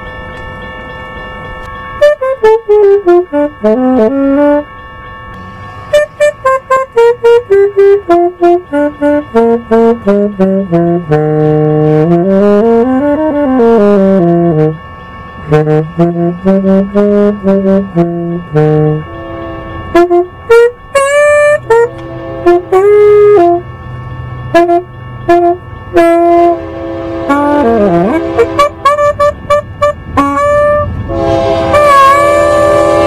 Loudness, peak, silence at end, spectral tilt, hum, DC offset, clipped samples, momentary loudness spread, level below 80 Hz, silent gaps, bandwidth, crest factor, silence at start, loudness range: -8 LUFS; 0 dBFS; 0 s; -7 dB/octave; none; 0.3%; 2%; 17 LU; -34 dBFS; none; 13 kHz; 8 dB; 0 s; 3 LU